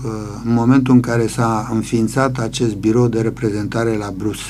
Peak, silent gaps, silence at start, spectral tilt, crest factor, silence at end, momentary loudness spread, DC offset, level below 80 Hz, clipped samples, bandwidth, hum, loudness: 0 dBFS; none; 0 s; -6.5 dB/octave; 16 dB; 0 s; 7 LU; under 0.1%; -40 dBFS; under 0.1%; 14 kHz; none; -17 LUFS